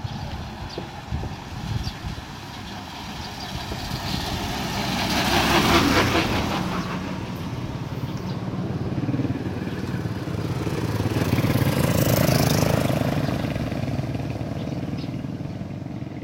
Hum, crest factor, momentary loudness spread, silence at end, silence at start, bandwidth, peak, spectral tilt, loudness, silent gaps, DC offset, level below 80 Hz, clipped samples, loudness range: none; 20 dB; 14 LU; 0 s; 0 s; 16 kHz; -4 dBFS; -5 dB/octave; -25 LUFS; none; under 0.1%; -40 dBFS; under 0.1%; 9 LU